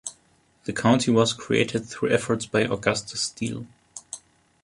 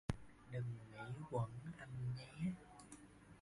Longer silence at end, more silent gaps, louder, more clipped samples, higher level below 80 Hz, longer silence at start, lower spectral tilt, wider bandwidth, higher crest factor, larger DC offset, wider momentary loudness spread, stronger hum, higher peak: first, 0.45 s vs 0 s; neither; first, -24 LUFS vs -48 LUFS; neither; first, -58 dBFS vs -64 dBFS; about the same, 0.05 s vs 0.1 s; second, -4.5 dB/octave vs -7 dB/octave; about the same, 11.5 kHz vs 11.5 kHz; about the same, 20 dB vs 24 dB; neither; first, 17 LU vs 14 LU; neither; first, -6 dBFS vs -24 dBFS